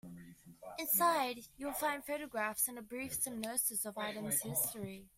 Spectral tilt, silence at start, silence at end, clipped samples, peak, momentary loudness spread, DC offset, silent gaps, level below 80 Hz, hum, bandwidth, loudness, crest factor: -2.5 dB/octave; 0.05 s; 0.1 s; under 0.1%; -20 dBFS; 13 LU; under 0.1%; none; -70 dBFS; none; 16 kHz; -36 LUFS; 20 dB